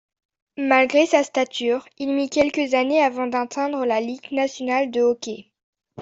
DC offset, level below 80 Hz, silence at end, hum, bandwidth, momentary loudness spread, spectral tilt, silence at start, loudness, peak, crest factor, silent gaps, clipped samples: under 0.1%; -64 dBFS; 0 s; none; 8 kHz; 9 LU; -3 dB/octave; 0.6 s; -21 LUFS; -4 dBFS; 18 dB; 5.63-5.73 s; under 0.1%